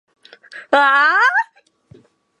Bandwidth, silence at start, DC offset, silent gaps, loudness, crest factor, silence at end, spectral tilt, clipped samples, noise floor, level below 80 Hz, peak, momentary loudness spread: 11.5 kHz; 0.55 s; under 0.1%; none; -14 LUFS; 18 dB; 0.95 s; -2 dB/octave; under 0.1%; -50 dBFS; -70 dBFS; 0 dBFS; 9 LU